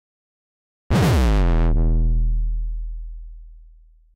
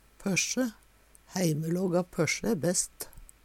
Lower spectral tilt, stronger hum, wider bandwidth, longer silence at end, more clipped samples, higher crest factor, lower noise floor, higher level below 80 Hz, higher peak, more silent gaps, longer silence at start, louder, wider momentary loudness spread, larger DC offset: first, -7 dB/octave vs -4 dB/octave; neither; second, 12.5 kHz vs 17 kHz; first, 0.55 s vs 0.2 s; neither; second, 8 dB vs 16 dB; second, -49 dBFS vs -59 dBFS; first, -22 dBFS vs -58 dBFS; about the same, -12 dBFS vs -14 dBFS; neither; first, 0.9 s vs 0.2 s; first, -21 LUFS vs -29 LUFS; first, 19 LU vs 8 LU; neither